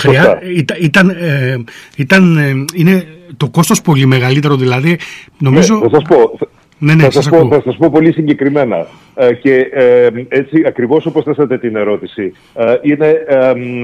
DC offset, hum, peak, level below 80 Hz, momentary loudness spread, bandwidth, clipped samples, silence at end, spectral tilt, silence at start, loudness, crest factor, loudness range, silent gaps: under 0.1%; none; 0 dBFS; -48 dBFS; 10 LU; 15 kHz; under 0.1%; 0 s; -6.5 dB/octave; 0 s; -10 LUFS; 10 dB; 3 LU; none